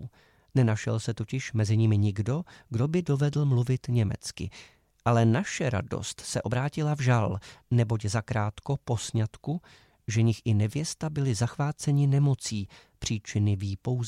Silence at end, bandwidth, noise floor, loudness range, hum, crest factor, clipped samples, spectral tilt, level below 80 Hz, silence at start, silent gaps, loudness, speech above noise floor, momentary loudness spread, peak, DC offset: 0 s; 12 kHz; -48 dBFS; 2 LU; none; 18 dB; under 0.1%; -6 dB/octave; -54 dBFS; 0 s; none; -28 LUFS; 21 dB; 11 LU; -10 dBFS; under 0.1%